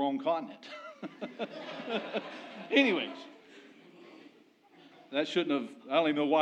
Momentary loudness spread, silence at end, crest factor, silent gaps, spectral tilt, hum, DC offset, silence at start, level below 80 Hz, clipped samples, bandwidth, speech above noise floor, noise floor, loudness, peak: 19 LU; 0 s; 22 dB; none; -5 dB/octave; none; under 0.1%; 0 s; under -90 dBFS; under 0.1%; 8.6 kHz; 30 dB; -62 dBFS; -32 LUFS; -10 dBFS